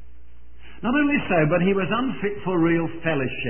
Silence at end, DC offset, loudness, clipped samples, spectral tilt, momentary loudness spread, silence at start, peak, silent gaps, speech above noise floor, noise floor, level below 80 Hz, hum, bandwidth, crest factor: 0 s; 2%; -22 LUFS; under 0.1%; -11.5 dB/octave; 6 LU; 0.65 s; -6 dBFS; none; 27 dB; -49 dBFS; -48 dBFS; 60 Hz at -45 dBFS; 3.3 kHz; 16 dB